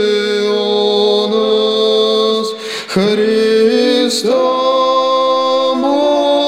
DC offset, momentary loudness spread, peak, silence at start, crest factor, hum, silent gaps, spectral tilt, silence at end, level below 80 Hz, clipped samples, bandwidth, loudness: under 0.1%; 3 LU; -2 dBFS; 0 s; 10 dB; none; none; -4 dB/octave; 0 s; -60 dBFS; under 0.1%; 15 kHz; -13 LUFS